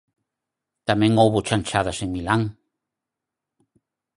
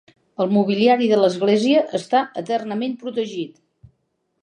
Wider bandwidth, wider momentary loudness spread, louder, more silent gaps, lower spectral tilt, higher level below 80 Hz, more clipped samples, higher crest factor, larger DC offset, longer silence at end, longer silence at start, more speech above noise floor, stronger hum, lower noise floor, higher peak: first, 11.5 kHz vs 9.8 kHz; about the same, 11 LU vs 11 LU; about the same, -21 LUFS vs -19 LUFS; neither; about the same, -5.5 dB/octave vs -6 dB/octave; first, -48 dBFS vs -68 dBFS; neither; first, 22 dB vs 16 dB; neither; first, 1.65 s vs 0.95 s; first, 0.85 s vs 0.4 s; first, 65 dB vs 52 dB; neither; first, -85 dBFS vs -71 dBFS; about the same, -2 dBFS vs -4 dBFS